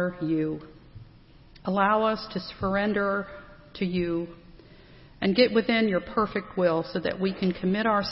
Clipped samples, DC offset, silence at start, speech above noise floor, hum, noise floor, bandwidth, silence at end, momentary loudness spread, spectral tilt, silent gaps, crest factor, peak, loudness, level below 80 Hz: under 0.1%; under 0.1%; 0 s; 26 dB; none; -52 dBFS; 5.8 kHz; 0 s; 12 LU; -9.5 dB/octave; none; 20 dB; -8 dBFS; -26 LUFS; -52 dBFS